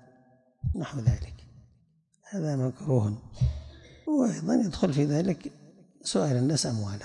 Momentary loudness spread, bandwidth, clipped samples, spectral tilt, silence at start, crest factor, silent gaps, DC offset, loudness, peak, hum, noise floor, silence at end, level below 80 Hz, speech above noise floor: 12 LU; 11.5 kHz; under 0.1%; -6.5 dB/octave; 0.65 s; 20 dB; none; under 0.1%; -29 LUFS; -10 dBFS; none; -67 dBFS; 0 s; -44 dBFS; 40 dB